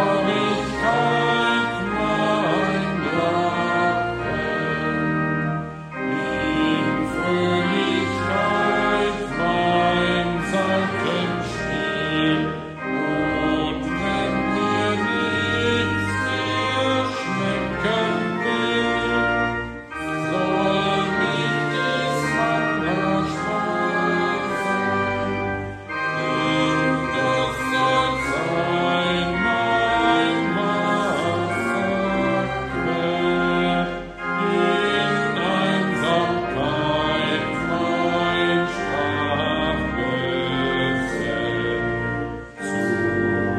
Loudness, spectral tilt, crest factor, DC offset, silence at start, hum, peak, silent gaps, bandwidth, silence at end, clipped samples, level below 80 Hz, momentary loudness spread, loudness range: -21 LUFS; -5.5 dB/octave; 16 dB; under 0.1%; 0 s; none; -6 dBFS; none; 13.5 kHz; 0 s; under 0.1%; -44 dBFS; 5 LU; 2 LU